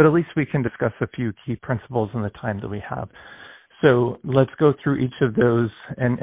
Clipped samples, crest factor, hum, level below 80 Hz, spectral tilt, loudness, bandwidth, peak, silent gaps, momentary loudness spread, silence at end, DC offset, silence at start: under 0.1%; 20 dB; none; -50 dBFS; -12 dB/octave; -22 LUFS; 3.9 kHz; -2 dBFS; none; 14 LU; 0 s; under 0.1%; 0 s